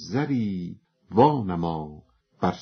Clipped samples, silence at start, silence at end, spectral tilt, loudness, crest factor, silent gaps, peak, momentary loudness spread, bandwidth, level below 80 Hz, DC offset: under 0.1%; 0 s; 0 s; -7 dB/octave; -25 LUFS; 22 dB; none; -4 dBFS; 15 LU; 6.4 kHz; -54 dBFS; under 0.1%